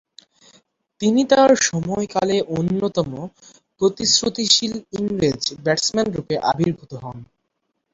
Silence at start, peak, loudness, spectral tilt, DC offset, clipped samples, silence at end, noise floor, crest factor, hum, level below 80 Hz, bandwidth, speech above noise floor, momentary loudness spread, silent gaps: 1 s; -2 dBFS; -19 LUFS; -3.5 dB/octave; under 0.1%; under 0.1%; 0.7 s; -74 dBFS; 20 dB; none; -54 dBFS; 8.2 kHz; 55 dB; 13 LU; none